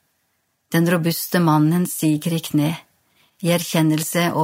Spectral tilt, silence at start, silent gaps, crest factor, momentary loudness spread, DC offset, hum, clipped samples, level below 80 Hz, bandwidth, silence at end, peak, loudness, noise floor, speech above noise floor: -5.5 dB/octave; 0.7 s; none; 14 dB; 6 LU; under 0.1%; none; under 0.1%; -68 dBFS; 16.5 kHz; 0 s; -6 dBFS; -19 LUFS; -69 dBFS; 51 dB